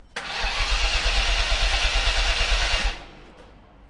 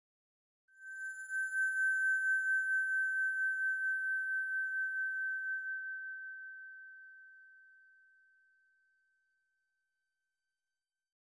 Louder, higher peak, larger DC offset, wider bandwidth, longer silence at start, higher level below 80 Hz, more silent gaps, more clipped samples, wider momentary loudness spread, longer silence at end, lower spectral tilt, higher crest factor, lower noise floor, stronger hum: first, -23 LUFS vs -34 LUFS; first, -8 dBFS vs -28 dBFS; neither; about the same, 11.5 kHz vs 11 kHz; second, 0.15 s vs 0.8 s; first, -26 dBFS vs under -90 dBFS; neither; neither; second, 6 LU vs 18 LU; second, 0.4 s vs 3.65 s; first, -1.5 dB/octave vs 6 dB/octave; about the same, 16 dB vs 12 dB; second, -48 dBFS vs under -90 dBFS; neither